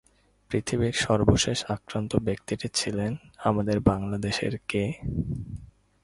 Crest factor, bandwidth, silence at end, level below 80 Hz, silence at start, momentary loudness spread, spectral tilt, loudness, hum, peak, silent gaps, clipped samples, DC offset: 22 dB; 11.5 kHz; 0.4 s; -44 dBFS; 0.5 s; 9 LU; -5 dB/octave; -27 LUFS; none; -6 dBFS; none; under 0.1%; under 0.1%